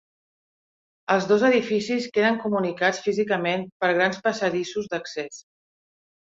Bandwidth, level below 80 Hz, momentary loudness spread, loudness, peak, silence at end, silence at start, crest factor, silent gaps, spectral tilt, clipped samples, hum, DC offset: 7.8 kHz; -68 dBFS; 11 LU; -23 LUFS; -6 dBFS; 0.95 s; 1.1 s; 18 dB; 3.72-3.80 s; -5 dB/octave; under 0.1%; none; under 0.1%